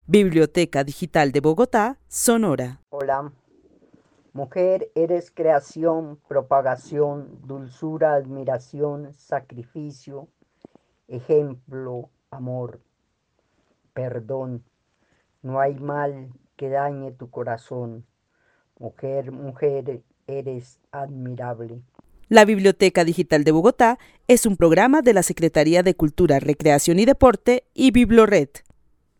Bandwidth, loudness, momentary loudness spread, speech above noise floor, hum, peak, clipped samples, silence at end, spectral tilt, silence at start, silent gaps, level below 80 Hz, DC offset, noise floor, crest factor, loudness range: 17.5 kHz; -20 LUFS; 21 LU; 52 dB; none; 0 dBFS; under 0.1%; 0.6 s; -5.5 dB/octave; 0.1 s; none; -46 dBFS; under 0.1%; -72 dBFS; 20 dB; 14 LU